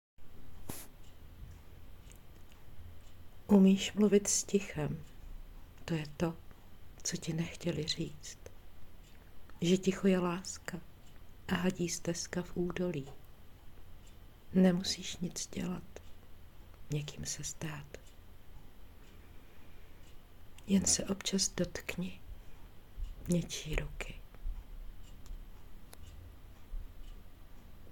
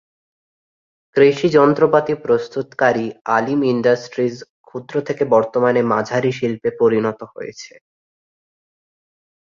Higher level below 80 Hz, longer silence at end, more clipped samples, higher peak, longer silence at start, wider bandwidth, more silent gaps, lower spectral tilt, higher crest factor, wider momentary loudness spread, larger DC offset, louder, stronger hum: first, -50 dBFS vs -62 dBFS; second, 0 s vs 1.9 s; neither; second, -14 dBFS vs -2 dBFS; second, 0.2 s vs 1.15 s; first, 17 kHz vs 7.4 kHz; second, none vs 4.50-4.64 s; second, -4.5 dB/octave vs -6.5 dB/octave; about the same, 22 dB vs 18 dB; first, 26 LU vs 17 LU; neither; second, -34 LUFS vs -17 LUFS; neither